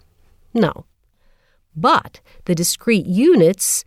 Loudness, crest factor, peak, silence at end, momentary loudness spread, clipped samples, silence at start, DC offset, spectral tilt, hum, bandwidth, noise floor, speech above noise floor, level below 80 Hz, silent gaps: -17 LUFS; 16 dB; -2 dBFS; 0.05 s; 16 LU; under 0.1%; 0.55 s; under 0.1%; -4.5 dB/octave; none; 16.5 kHz; -57 dBFS; 40 dB; -52 dBFS; none